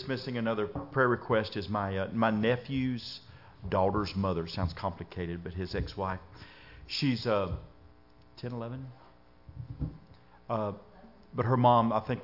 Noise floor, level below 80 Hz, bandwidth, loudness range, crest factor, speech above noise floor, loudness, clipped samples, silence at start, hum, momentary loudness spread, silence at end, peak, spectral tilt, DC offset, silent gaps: -59 dBFS; -52 dBFS; 5.8 kHz; 10 LU; 20 dB; 28 dB; -31 LUFS; under 0.1%; 0 s; none; 17 LU; 0 s; -12 dBFS; -7.5 dB/octave; under 0.1%; none